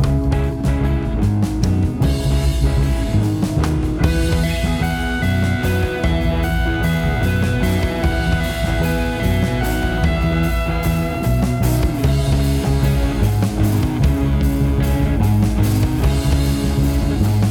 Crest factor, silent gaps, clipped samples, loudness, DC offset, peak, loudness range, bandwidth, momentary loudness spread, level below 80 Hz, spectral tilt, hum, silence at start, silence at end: 14 dB; none; under 0.1%; -18 LUFS; under 0.1%; -2 dBFS; 1 LU; 18.5 kHz; 2 LU; -22 dBFS; -6.5 dB/octave; none; 0 s; 0 s